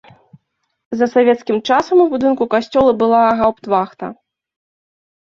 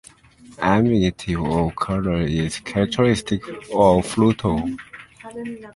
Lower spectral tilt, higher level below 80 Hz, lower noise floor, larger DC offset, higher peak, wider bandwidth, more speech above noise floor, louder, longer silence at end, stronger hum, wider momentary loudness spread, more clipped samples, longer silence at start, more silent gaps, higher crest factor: about the same, -6 dB/octave vs -6.5 dB/octave; second, -52 dBFS vs -40 dBFS; first, -65 dBFS vs -47 dBFS; neither; about the same, -2 dBFS vs -2 dBFS; second, 7.4 kHz vs 11.5 kHz; first, 51 dB vs 27 dB; first, -15 LUFS vs -20 LUFS; first, 1.1 s vs 0.05 s; neither; second, 10 LU vs 16 LU; neither; first, 0.9 s vs 0.5 s; neither; second, 14 dB vs 20 dB